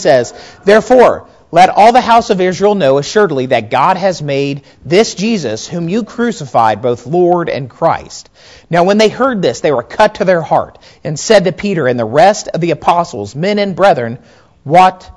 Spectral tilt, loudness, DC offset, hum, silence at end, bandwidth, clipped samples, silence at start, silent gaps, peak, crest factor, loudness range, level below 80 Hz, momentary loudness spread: -5 dB/octave; -11 LUFS; 0.2%; none; 0.05 s; 11 kHz; 2%; 0 s; none; 0 dBFS; 12 dB; 5 LU; -46 dBFS; 11 LU